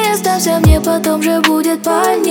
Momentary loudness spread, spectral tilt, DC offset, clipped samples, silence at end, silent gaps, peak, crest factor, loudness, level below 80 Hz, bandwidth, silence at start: 3 LU; -5 dB/octave; under 0.1%; under 0.1%; 0 s; none; 0 dBFS; 12 dB; -13 LUFS; -22 dBFS; over 20 kHz; 0 s